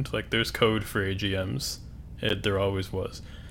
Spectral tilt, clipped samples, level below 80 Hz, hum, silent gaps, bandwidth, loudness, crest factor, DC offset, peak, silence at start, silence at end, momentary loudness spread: -4.5 dB/octave; under 0.1%; -44 dBFS; none; none; 17.5 kHz; -28 LUFS; 20 dB; under 0.1%; -8 dBFS; 0 s; 0 s; 12 LU